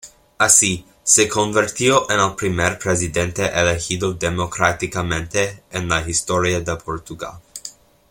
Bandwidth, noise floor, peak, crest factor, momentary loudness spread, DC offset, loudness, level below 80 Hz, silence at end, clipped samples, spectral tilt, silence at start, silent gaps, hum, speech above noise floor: 16.5 kHz; -40 dBFS; 0 dBFS; 20 dB; 16 LU; under 0.1%; -18 LUFS; -44 dBFS; 0.4 s; under 0.1%; -3 dB/octave; 0.05 s; none; none; 21 dB